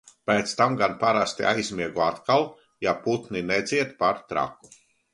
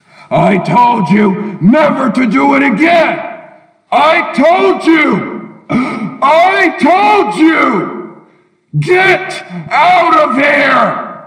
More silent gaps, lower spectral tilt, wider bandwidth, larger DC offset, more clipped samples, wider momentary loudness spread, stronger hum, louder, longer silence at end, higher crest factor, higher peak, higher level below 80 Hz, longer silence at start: neither; second, -4.5 dB/octave vs -6.5 dB/octave; about the same, 11.5 kHz vs 11 kHz; neither; neither; second, 7 LU vs 10 LU; neither; second, -25 LUFS vs -9 LUFS; first, 0.6 s vs 0 s; first, 20 dB vs 10 dB; second, -6 dBFS vs 0 dBFS; second, -60 dBFS vs -52 dBFS; about the same, 0.25 s vs 0.3 s